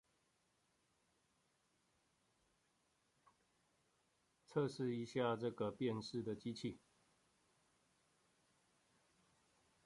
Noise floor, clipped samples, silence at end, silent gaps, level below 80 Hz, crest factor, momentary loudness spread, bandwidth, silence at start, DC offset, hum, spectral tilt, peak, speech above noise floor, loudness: -82 dBFS; under 0.1%; 3.1 s; none; -82 dBFS; 22 dB; 7 LU; 11 kHz; 4.5 s; under 0.1%; none; -6.5 dB/octave; -26 dBFS; 39 dB; -44 LUFS